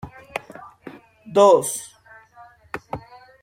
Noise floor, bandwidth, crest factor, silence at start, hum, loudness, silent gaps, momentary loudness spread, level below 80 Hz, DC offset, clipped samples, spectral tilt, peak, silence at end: -49 dBFS; 16 kHz; 20 dB; 0.05 s; none; -19 LUFS; none; 27 LU; -58 dBFS; under 0.1%; under 0.1%; -4 dB/octave; -2 dBFS; 0.45 s